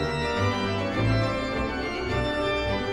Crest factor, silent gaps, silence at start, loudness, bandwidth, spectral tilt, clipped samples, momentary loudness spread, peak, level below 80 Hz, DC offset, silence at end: 14 dB; none; 0 s; -26 LUFS; 11.5 kHz; -6 dB/octave; under 0.1%; 4 LU; -12 dBFS; -38 dBFS; under 0.1%; 0 s